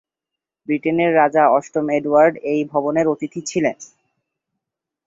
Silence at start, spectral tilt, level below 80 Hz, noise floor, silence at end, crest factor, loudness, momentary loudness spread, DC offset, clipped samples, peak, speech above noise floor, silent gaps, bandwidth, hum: 0.7 s; -5.5 dB/octave; -64 dBFS; -85 dBFS; 1.25 s; 18 dB; -18 LUFS; 10 LU; under 0.1%; under 0.1%; -2 dBFS; 68 dB; none; 8 kHz; none